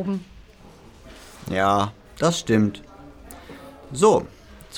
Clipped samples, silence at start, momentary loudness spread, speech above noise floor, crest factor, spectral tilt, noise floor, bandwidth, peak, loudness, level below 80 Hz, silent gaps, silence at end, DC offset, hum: under 0.1%; 0 s; 24 LU; 26 dB; 20 dB; -5 dB/octave; -47 dBFS; 19 kHz; -4 dBFS; -22 LUFS; -50 dBFS; none; 0 s; under 0.1%; none